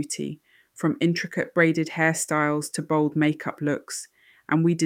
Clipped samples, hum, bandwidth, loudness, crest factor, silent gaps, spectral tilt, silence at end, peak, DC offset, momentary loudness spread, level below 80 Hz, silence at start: under 0.1%; none; 16 kHz; -24 LUFS; 18 dB; none; -5 dB/octave; 0 s; -6 dBFS; under 0.1%; 12 LU; -72 dBFS; 0 s